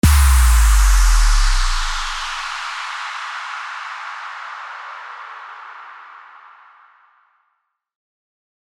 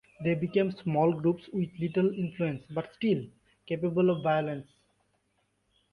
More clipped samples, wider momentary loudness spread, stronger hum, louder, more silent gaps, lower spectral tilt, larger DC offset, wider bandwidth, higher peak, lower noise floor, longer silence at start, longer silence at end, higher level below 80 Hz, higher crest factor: neither; first, 21 LU vs 10 LU; neither; first, -19 LUFS vs -30 LUFS; neither; second, -3 dB/octave vs -9.5 dB/octave; neither; first, 18 kHz vs 5.2 kHz; first, -2 dBFS vs -14 dBFS; second, -71 dBFS vs -75 dBFS; second, 0.05 s vs 0.2 s; first, 2.45 s vs 1.3 s; first, -18 dBFS vs -66 dBFS; about the same, 16 dB vs 16 dB